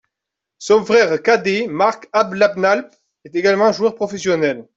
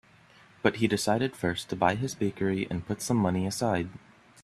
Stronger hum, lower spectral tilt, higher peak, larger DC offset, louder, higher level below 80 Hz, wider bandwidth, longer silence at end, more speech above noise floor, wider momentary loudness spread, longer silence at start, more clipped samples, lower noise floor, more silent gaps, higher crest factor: neither; about the same, -4.5 dB/octave vs -5.5 dB/octave; first, -2 dBFS vs -6 dBFS; neither; first, -16 LUFS vs -29 LUFS; about the same, -62 dBFS vs -60 dBFS; second, 8 kHz vs 14 kHz; second, 0.15 s vs 0.45 s; first, 66 dB vs 29 dB; about the same, 6 LU vs 5 LU; about the same, 0.6 s vs 0.65 s; neither; first, -83 dBFS vs -57 dBFS; neither; second, 14 dB vs 22 dB